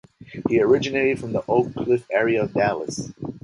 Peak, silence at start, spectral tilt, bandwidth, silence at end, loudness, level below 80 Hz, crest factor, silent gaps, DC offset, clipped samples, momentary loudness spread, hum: -4 dBFS; 0.2 s; -6 dB/octave; 11.5 kHz; 0.05 s; -22 LUFS; -54 dBFS; 16 dB; none; under 0.1%; under 0.1%; 12 LU; none